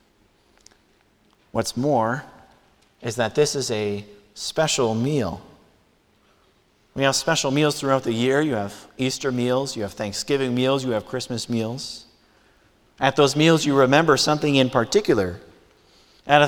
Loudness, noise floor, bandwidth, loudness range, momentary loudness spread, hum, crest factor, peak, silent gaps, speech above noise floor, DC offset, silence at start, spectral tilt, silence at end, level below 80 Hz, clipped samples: -22 LUFS; -61 dBFS; 18.5 kHz; 7 LU; 14 LU; none; 22 dB; -2 dBFS; none; 39 dB; under 0.1%; 1.55 s; -4.5 dB/octave; 0 s; -56 dBFS; under 0.1%